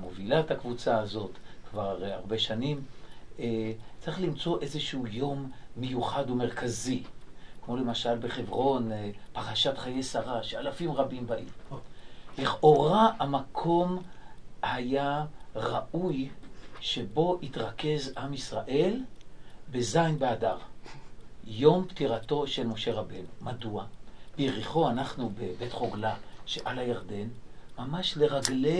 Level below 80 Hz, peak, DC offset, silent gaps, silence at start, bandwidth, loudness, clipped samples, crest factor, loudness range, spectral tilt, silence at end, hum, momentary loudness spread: -50 dBFS; -6 dBFS; 0.7%; none; 0 s; 11 kHz; -31 LUFS; under 0.1%; 26 dB; 6 LU; -5.5 dB/octave; 0 s; none; 14 LU